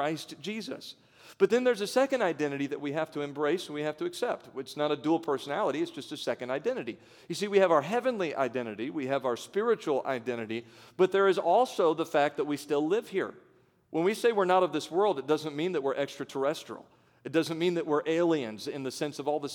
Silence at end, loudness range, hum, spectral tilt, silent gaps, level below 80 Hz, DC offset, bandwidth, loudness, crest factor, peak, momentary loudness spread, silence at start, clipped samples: 0 s; 4 LU; none; -5 dB/octave; none; -82 dBFS; under 0.1%; 18 kHz; -30 LUFS; 18 dB; -10 dBFS; 12 LU; 0 s; under 0.1%